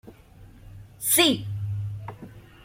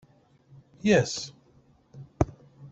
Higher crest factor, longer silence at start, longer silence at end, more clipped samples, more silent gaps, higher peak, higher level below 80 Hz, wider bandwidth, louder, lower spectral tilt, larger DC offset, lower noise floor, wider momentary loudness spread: about the same, 22 dB vs 22 dB; second, 0.05 s vs 0.85 s; about the same, 0 s vs 0.05 s; neither; neither; about the same, -6 dBFS vs -8 dBFS; second, -54 dBFS vs -48 dBFS; first, 16.5 kHz vs 8.2 kHz; first, -23 LUFS vs -27 LUFS; second, -3 dB/octave vs -5 dB/octave; neither; second, -49 dBFS vs -61 dBFS; second, 21 LU vs 24 LU